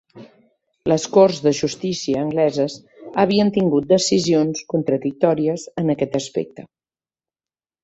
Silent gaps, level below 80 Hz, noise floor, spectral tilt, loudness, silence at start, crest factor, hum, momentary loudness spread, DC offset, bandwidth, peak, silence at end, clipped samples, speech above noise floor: none; -58 dBFS; under -90 dBFS; -5.5 dB/octave; -19 LUFS; 0.15 s; 18 dB; none; 10 LU; under 0.1%; 8.2 kHz; -2 dBFS; 1.2 s; under 0.1%; over 72 dB